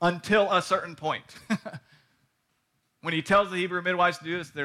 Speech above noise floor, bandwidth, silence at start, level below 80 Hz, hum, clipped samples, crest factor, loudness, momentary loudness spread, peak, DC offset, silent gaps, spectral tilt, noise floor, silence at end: 48 dB; 14.5 kHz; 0 s; -62 dBFS; none; under 0.1%; 16 dB; -26 LUFS; 11 LU; -12 dBFS; under 0.1%; none; -5 dB/octave; -74 dBFS; 0 s